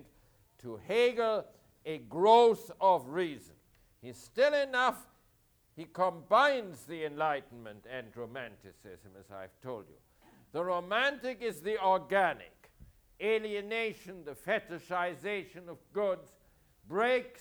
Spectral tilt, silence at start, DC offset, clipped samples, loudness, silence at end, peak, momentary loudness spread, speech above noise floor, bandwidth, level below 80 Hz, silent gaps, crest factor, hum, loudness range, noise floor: -4.5 dB/octave; 0.65 s; under 0.1%; under 0.1%; -31 LUFS; 0.1 s; -12 dBFS; 20 LU; 37 dB; over 20 kHz; -70 dBFS; none; 22 dB; none; 10 LU; -69 dBFS